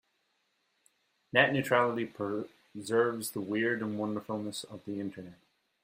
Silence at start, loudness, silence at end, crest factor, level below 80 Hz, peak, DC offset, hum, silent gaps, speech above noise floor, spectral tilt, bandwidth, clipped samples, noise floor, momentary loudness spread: 1.35 s; -31 LUFS; 0.5 s; 24 dB; -74 dBFS; -8 dBFS; under 0.1%; none; none; 45 dB; -4.5 dB/octave; 16 kHz; under 0.1%; -77 dBFS; 15 LU